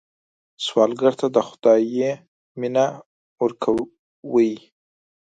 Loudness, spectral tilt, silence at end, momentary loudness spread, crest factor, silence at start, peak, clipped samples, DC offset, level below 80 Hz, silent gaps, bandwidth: -21 LUFS; -5.5 dB/octave; 0.65 s; 17 LU; 18 dB; 0.6 s; -4 dBFS; under 0.1%; under 0.1%; -64 dBFS; 2.28-2.55 s, 3.06-3.36 s, 3.99-4.23 s; 9.2 kHz